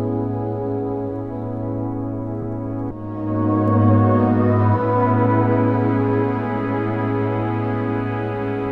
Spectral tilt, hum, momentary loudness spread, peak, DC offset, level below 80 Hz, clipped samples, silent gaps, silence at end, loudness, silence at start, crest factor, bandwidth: -11 dB/octave; none; 10 LU; -4 dBFS; under 0.1%; -44 dBFS; under 0.1%; none; 0 s; -20 LUFS; 0 s; 16 dB; 4.1 kHz